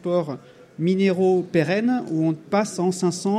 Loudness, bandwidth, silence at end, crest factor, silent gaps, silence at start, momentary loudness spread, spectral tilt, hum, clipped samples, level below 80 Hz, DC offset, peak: -22 LUFS; 12.5 kHz; 0 s; 16 dB; none; 0.05 s; 6 LU; -6.5 dB/octave; none; under 0.1%; -68 dBFS; under 0.1%; -6 dBFS